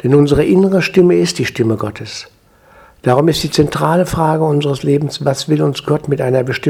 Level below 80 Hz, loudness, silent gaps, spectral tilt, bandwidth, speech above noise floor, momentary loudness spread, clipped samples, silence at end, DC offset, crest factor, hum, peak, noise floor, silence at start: -40 dBFS; -14 LUFS; none; -6 dB/octave; 16.5 kHz; 32 dB; 8 LU; under 0.1%; 0 s; under 0.1%; 14 dB; none; 0 dBFS; -46 dBFS; 0.05 s